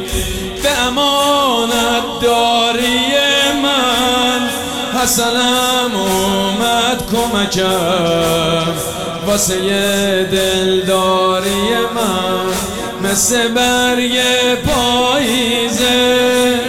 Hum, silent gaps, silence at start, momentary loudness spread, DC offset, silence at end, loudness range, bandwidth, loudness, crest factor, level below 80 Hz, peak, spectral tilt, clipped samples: none; none; 0 s; 5 LU; 0.5%; 0 s; 2 LU; 17.5 kHz; -13 LUFS; 10 dB; -36 dBFS; -4 dBFS; -3 dB/octave; under 0.1%